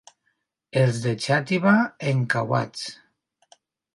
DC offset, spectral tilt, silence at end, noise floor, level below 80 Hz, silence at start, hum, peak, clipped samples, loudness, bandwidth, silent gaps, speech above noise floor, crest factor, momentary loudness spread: under 0.1%; -6 dB/octave; 1 s; -74 dBFS; -64 dBFS; 0.75 s; none; -4 dBFS; under 0.1%; -23 LUFS; 11.5 kHz; none; 51 dB; 20 dB; 11 LU